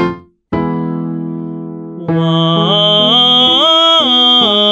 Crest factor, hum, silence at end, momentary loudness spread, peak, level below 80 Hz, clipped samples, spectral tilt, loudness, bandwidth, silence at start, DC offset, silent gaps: 12 dB; none; 0 s; 16 LU; 0 dBFS; -46 dBFS; under 0.1%; -5.5 dB/octave; -9 LUFS; 8.4 kHz; 0 s; under 0.1%; none